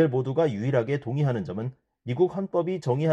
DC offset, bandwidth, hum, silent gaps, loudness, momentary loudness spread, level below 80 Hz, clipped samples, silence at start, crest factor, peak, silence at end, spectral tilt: under 0.1%; 8.4 kHz; none; none; -27 LUFS; 10 LU; -64 dBFS; under 0.1%; 0 s; 16 dB; -10 dBFS; 0 s; -8.5 dB/octave